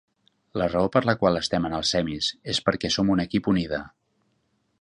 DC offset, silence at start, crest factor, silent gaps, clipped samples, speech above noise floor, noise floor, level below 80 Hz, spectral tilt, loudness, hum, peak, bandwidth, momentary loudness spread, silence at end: under 0.1%; 0.55 s; 22 dB; none; under 0.1%; 47 dB; -71 dBFS; -48 dBFS; -5 dB/octave; -24 LUFS; none; -4 dBFS; 11 kHz; 6 LU; 0.95 s